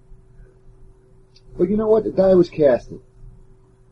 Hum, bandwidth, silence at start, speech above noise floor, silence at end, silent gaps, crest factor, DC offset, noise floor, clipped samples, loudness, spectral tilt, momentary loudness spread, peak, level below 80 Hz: none; 6.8 kHz; 1.55 s; 33 dB; 0.6 s; none; 16 dB; under 0.1%; -50 dBFS; under 0.1%; -17 LUFS; -9 dB/octave; 15 LU; -4 dBFS; -44 dBFS